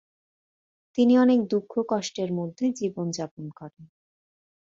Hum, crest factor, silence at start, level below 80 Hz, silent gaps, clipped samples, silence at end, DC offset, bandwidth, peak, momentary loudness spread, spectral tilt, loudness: none; 16 dB; 0.95 s; -70 dBFS; 3.31-3.37 s; under 0.1%; 0.85 s; under 0.1%; 7.6 kHz; -10 dBFS; 21 LU; -6 dB/octave; -25 LUFS